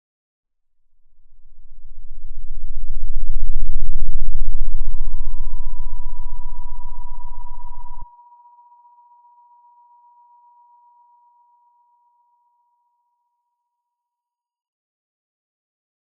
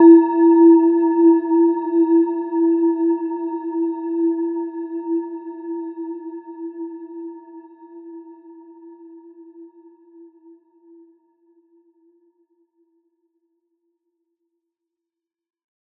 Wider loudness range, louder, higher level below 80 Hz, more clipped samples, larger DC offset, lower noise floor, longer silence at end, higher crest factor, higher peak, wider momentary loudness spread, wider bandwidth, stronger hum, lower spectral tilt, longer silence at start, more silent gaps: about the same, 23 LU vs 25 LU; second, -32 LUFS vs -17 LUFS; first, -22 dBFS vs under -90 dBFS; neither; neither; about the same, -87 dBFS vs -86 dBFS; first, 8 s vs 6.35 s; second, 12 dB vs 20 dB; about the same, 0 dBFS vs -2 dBFS; about the same, 24 LU vs 23 LU; second, 1 kHz vs 2.8 kHz; neither; first, -12 dB/octave vs -10.5 dB/octave; first, 1.45 s vs 0 s; neither